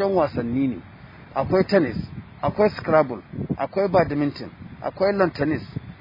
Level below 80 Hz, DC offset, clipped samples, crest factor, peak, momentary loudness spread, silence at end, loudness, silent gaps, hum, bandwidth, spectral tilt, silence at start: -50 dBFS; under 0.1%; under 0.1%; 20 dB; -4 dBFS; 13 LU; 0.05 s; -23 LUFS; none; none; 5.4 kHz; -9 dB/octave; 0 s